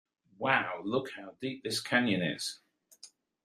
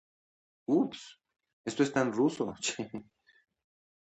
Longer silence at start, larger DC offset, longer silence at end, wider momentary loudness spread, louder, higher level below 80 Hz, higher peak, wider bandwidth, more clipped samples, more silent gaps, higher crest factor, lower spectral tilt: second, 0.4 s vs 0.7 s; neither; second, 0.4 s vs 1.05 s; second, 11 LU vs 17 LU; about the same, -32 LUFS vs -32 LUFS; about the same, -78 dBFS vs -74 dBFS; first, -10 dBFS vs -14 dBFS; first, 15 kHz vs 8.8 kHz; neither; second, none vs 1.53-1.64 s; about the same, 24 dB vs 20 dB; about the same, -4 dB/octave vs -4.5 dB/octave